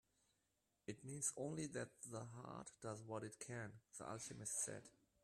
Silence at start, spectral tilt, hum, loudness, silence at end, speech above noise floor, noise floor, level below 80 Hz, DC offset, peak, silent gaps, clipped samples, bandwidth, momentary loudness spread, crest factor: 0.9 s; -4 dB/octave; none; -50 LUFS; 0.35 s; 36 dB; -87 dBFS; -82 dBFS; under 0.1%; -28 dBFS; none; under 0.1%; 14 kHz; 11 LU; 22 dB